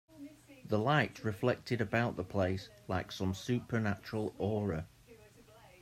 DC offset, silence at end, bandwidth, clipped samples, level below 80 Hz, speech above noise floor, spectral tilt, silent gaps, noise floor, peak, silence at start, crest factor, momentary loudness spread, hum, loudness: under 0.1%; 0.15 s; 15 kHz; under 0.1%; -64 dBFS; 25 dB; -6.5 dB/octave; none; -59 dBFS; -14 dBFS; 0.1 s; 22 dB; 13 LU; none; -35 LUFS